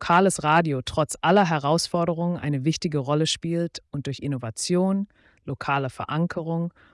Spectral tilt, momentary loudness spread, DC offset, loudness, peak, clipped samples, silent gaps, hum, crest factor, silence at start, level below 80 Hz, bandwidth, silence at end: -5 dB/octave; 11 LU; under 0.1%; -24 LUFS; -8 dBFS; under 0.1%; none; none; 16 dB; 0 s; -56 dBFS; 12 kHz; 0.25 s